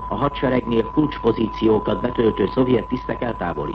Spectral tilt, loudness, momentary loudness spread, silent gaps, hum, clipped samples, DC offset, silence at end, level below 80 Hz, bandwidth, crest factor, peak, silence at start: -9 dB/octave; -21 LUFS; 6 LU; none; none; under 0.1%; under 0.1%; 0 s; -38 dBFS; 6 kHz; 16 dB; -4 dBFS; 0 s